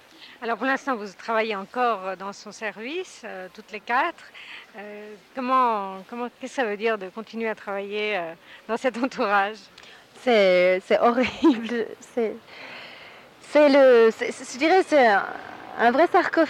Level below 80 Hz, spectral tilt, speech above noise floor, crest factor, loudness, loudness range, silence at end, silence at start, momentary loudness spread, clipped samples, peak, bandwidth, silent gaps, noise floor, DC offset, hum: -68 dBFS; -4.5 dB/octave; 23 dB; 16 dB; -23 LUFS; 9 LU; 0 s; 0.2 s; 21 LU; under 0.1%; -8 dBFS; 14 kHz; none; -46 dBFS; under 0.1%; none